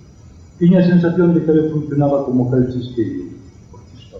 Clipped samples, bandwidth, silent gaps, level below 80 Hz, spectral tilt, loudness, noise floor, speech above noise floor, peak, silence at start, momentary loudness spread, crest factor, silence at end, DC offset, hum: under 0.1%; 6.2 kHz; none; -46 dBFS; -10 dB/octave; -15 LUFS; -41 dBFS; 27 dB; -4 dBFS; 0.6 s; 10 LU; 12 dB; 0 s; under 0.1%; none